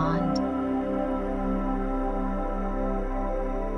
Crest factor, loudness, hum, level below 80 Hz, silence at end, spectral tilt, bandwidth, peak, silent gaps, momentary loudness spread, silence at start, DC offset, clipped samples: 14 dB; -29 LUFS; none; -32 dBFS; 0 s; -8 dB/octave; 6.4 kHz; -12 dBFS; none; 4 LU; 0 s; under 0.1%; under 0.1%